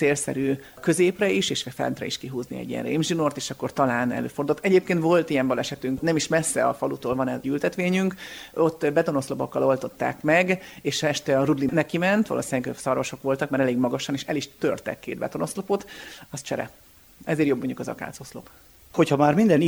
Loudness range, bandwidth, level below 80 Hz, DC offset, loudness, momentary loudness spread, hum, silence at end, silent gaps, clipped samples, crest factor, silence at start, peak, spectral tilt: 6 LU; over 20 kHz; -58 dBFS; under 0.1%; -24 LUFS; 11 LU; none; 0 s; none; under 0.1%; 18 dB; 0 s; -6 dBFS; -5 dB/octave